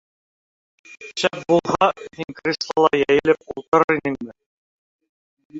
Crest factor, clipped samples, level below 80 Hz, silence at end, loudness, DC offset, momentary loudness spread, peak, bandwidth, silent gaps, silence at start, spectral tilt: 20 dB; under 0.1%; -58 dBFS; 0 s; -20 LUFS; under 0.1%; 15 LU; -2 dBFS; 8 kHz; 3.68-3.72 s, 3.84-3.88 s, 4.46-4.99 s, 5.09-5.37 s, 5.45-5.50 s; 0.9 s; -5 dB/octave